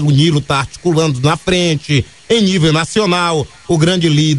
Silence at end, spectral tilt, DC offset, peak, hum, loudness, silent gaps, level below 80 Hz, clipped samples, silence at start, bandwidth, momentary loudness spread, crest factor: 0 s; -5.5 dB/octave; 0.4%; 0 dBFS; none; -13 LUFS; none; -40 dBFS; under 0.1%; 0 s; 11 kHz; 5 LU; 12 dB